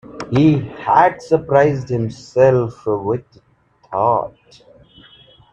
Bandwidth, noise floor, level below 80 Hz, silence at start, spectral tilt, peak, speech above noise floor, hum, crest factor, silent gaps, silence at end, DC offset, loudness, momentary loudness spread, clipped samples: 8.6 kHz; -47 dBFS; -50 dBFS; 0.05 s; -8 dB/octave; 0 dBFS; 31 dB; none; 18 dB; none; 1.25 s; under 0.1%; -17 LUFS; 9 LU; under 0.1%